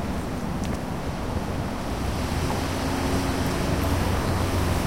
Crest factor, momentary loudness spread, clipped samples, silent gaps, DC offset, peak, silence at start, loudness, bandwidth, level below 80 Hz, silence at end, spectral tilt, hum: 14 dB; 5 LU; under 0.1%; none; 0.8%; -10 dBFS; 0 s; -27 LUFS; 16 kHz; -34 dBFS; 0 s; -5.5 dB/octave; none